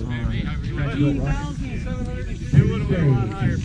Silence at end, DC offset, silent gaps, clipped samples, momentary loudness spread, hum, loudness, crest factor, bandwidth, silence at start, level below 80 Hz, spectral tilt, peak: 0 s; under 0.1%; none; under 0.1%; 10 LU; none; -23 LUFS; 20 dB; 8.8 kHz; 0 s; -30 dBFS; -8 dB/octave; -2 dBFS